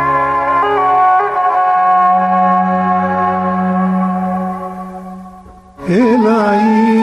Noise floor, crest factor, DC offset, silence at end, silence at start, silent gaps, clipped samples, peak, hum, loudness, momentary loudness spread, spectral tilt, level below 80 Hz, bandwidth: -37 dBFS; 10 dB; under 0.1%; 0 s; 0 s; none; under 0.1%; -2 dBFS; none; -12 LUFS; 14 LU; -8 dB/octave; -48 dBFS; 10.5 kHz